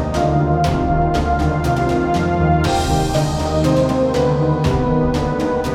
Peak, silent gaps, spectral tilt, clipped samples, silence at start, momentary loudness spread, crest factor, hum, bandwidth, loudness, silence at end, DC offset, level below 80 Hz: -2 dBFS; none; -7 dB/octave; under 0.1%; 0 s; 2 LU; 14 dB; none; 15 kHz; -17 LUFS; 0 s; 0.2%; -26 dBFS